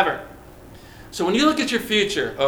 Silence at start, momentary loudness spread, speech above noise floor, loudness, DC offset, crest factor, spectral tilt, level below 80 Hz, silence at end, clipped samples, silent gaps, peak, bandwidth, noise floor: 0 s; 16 LU; 23 dB; -21 LUFS; under 0.1%; 20 dB; -3.5 dB/octave; -50 dBFS; 0 s; under 0.1%; none; -2 dBFS; over 20 kHz; -43 dBFS